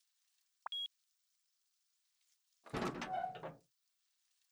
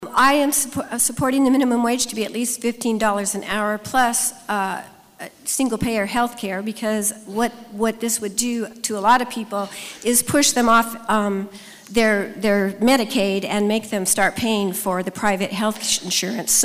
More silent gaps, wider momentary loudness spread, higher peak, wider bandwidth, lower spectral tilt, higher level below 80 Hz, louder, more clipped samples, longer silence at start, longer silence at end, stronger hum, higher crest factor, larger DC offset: neither; about the same, 11 LU vs 9 LU; second, -28 dBFS vs -6 dBFS; first, over 20 kHz vs 16 kHz; first, -4.5 dB/octave vs -3 dB/octave; second, -72 dBFS vs -52 dBFS; second, -44 LUFS vs -20 LUFS; neither; first, 0.7 s vs 0 s; first, 0.95 s vs 0 s; neither; first, 22 dB vs 14 dB; neither